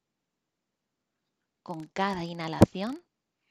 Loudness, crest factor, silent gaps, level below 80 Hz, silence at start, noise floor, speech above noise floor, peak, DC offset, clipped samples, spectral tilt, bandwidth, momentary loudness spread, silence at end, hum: -28 LUFS; 30 dB; none; -52 dBFS; 1.7 s; -85 dBFS; 57 dB; -2 dBFS; under 0.1%; under 0.1%; -7 dB/octave; 14.5 kHz; 18 LU; 0.5 s; none